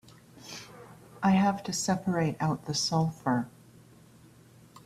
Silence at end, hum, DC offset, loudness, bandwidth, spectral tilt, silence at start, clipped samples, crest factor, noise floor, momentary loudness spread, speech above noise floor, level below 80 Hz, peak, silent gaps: 0.05 s; none; under 0.1%; -28 LUFS; 14 kHz; -5 dB/octave; 0.4 s; under 0.1%; 18 dB; -56 dBFS; 19 LU; 28 dB; -64 dBFS; -12 dBFS; none